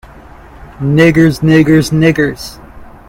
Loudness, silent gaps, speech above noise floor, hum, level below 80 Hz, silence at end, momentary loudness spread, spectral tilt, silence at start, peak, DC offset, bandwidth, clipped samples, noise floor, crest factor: -10 LUFS; none; 26 dB; none; -34 dBFS; 0.2 s; 13 LU; -7 dB/octave; 0.6 s; 0 dBFS; under 0.1%; 16.5 kHz; 0.1%; -35 dBFS; 12 dB